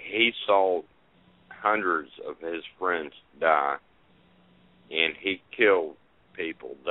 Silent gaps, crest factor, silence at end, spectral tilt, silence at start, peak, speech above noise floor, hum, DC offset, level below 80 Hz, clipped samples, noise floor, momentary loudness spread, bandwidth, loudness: none; 22 dB; 0 s; 0 dB/octave; 0 s; -6 dBFS; 34 dB; none; under 0.1%; -70 dBFS; under 0.1%; -61 dBFS; 14 LU; 4.1 kHz; -26 LUFS